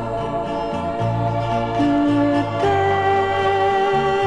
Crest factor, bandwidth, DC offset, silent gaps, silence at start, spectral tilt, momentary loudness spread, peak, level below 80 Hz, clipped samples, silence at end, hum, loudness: 12 dB; 10 kHz; under 0.1%; none; 0 s; -7 dB/octave; 6 LU; -6 dBFS; -42 dBFS; under 0.1%; 0 s; none; -19 LUFS